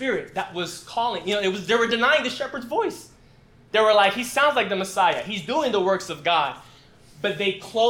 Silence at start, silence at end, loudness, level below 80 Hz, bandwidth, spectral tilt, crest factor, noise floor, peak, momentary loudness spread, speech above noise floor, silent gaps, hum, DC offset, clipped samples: 0 s; 0 s; -23 LUFS; -60 dBFS; 17.5 kHz; -3.5 dB/octave; 18 dB; -52 dBFS; -6 dBFS; 11 LU; 30 dB; none; none; under 0.1%; under 0.1%